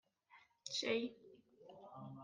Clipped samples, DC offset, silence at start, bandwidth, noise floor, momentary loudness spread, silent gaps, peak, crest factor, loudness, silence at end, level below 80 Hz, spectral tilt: under 0.1%; under 0.1%; 0.3 s; 10 kHz; -70 dBFS; 24 LU; none; -26 dBFS; 20 dB; -43 LUFS; 0 s; -90 dBFS; -3 dB/octave